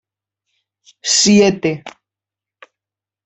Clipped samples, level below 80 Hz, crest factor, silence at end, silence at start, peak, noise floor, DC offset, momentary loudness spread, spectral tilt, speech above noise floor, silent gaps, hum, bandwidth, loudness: under 0.1%; -56 dBFS; 18 dB; 1.35 s; 1.05 s; -2 dBFS; -88 dBFS; under 0.1%; 15 LU; -3.5 dB/octave; 74 dB; none; none; 8.4 kHz; -13 LUFS